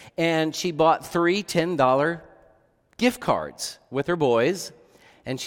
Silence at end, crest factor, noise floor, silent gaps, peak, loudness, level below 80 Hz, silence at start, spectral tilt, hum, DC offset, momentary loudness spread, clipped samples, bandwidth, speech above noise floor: 0 s; 18 dB; -61 dBFS; none; -6 dBFS; -23 LUFS; -58 dBFS; 0 s; -5 dB/octave; none; under 0.1%; 12 LU; under 0.1%; 17.5 kHz; 39 dB